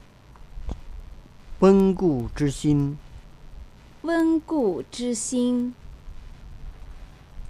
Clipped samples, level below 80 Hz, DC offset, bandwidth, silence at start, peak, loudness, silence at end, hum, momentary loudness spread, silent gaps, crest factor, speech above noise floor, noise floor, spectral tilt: under 0.1%; -40 dBFS; under 0.1%; 12.5 kHz; 0.4 s; -4 dBFS; -23 LUFS; 0 s; none; 26 LU; none; 22 dB; 25 dB; -47 dBFS; -6.5 dB/octave